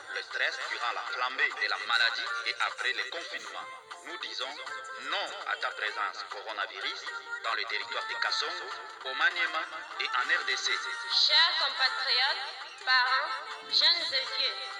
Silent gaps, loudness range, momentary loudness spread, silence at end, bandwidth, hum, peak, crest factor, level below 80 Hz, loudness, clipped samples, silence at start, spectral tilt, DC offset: none; 9 LU; 14 LU; 0 s; 16.5 kHz; none; -12 dBFS; 20 dB; under -90 dBFS; -29 LUFS; under 0.1%; 0 s; 2 dB/octave; under 0.1%